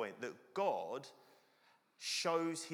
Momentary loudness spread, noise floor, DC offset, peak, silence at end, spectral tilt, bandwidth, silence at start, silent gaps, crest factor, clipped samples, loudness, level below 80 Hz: 12 LU; -72 dBFS; under 0.1%; -22 dBFS; 0 s; -3 dB/octave; over 20 kHz; 0 s; none; 18 dB; under 0.1%; -40 LUFS; under -90 dBFS